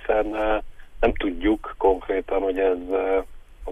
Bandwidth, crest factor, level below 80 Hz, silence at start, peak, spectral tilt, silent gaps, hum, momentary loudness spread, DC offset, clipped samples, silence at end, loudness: 3.8 kHz; 18 dB; -36 dBFS; 0 s; -6 dBFS; -7 dB/octave; none; none; 4 LU; under 0.1%; under 0.1%; 0 s; -24 LUFS